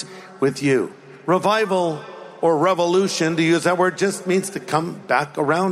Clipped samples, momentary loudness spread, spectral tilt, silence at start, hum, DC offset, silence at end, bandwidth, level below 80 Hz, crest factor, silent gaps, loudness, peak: under 0.1%; 7 LU; -5 dB/octave; 0 s; none; under 0.1%; 0 s; 14.5 kHz; -68 dBFS; 16 dB; none; -20 LUFS; -4 dBFS